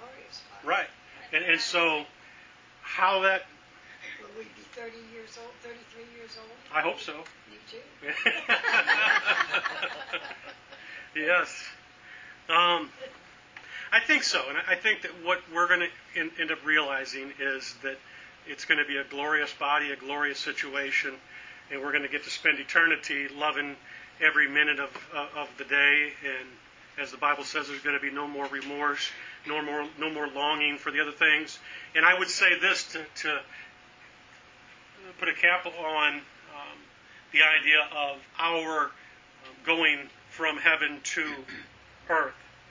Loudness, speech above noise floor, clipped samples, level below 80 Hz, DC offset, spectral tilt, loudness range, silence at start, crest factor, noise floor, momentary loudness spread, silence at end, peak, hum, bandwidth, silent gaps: -26 LUFS; 25 dB; under 0.1%; -72 dBFS; under 0.1%; -1.5 dB/octave; 6 LU; 0 s; 24 dB; -54 dBFS; 23 LU; 0.25 s; -4 dBFS; none; 7.6 kHz; none